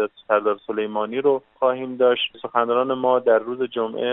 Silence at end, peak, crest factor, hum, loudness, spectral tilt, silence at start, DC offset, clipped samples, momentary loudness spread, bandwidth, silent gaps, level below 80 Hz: 0 s; -2 dBFS; 18 dB; none; -21 LUFS; -2 dB/octave; 0 s; under 0.1%; under 0.1%; 6 LU; 4 kHz; none; -72 dBFS